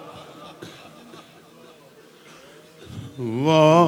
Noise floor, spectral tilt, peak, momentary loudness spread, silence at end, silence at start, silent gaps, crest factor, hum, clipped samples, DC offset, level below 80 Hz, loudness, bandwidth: -49 dBFS; -6.5 dB/octave; -2 dBFS; 28 LU; 0 s; 0 s; none; 20 dB; none; under 0.1%; under 0.1%; -66 dBFS; -19 LUFS; 16 kHz